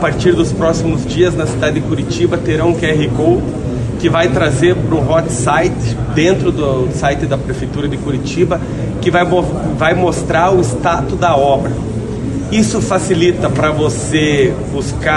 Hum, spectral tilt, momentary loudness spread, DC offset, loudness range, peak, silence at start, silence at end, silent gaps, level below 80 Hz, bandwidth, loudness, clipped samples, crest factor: none; -6 dB/octave; 7 LU; under 0.1%; 2 LU; 0 dBFS; 0 s; 0 s; none; -28 dBFS; 11.5 kHz; -14 LUFS; under 0.1%; 14 dB